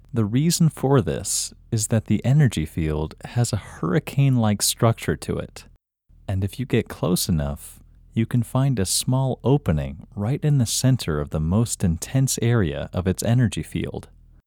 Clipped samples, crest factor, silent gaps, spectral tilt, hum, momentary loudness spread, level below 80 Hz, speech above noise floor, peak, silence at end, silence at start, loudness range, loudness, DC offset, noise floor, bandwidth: under 0.1%; 18 dB; none; -5.5 dB/octave; none; 10 LU; -40 dBFS; 33 dB; -4 dBFS; 0.45 s; 0.15 s; 3 LU; -22 LUFS; under 0.1%; -55 dBFS; 18.5 kHz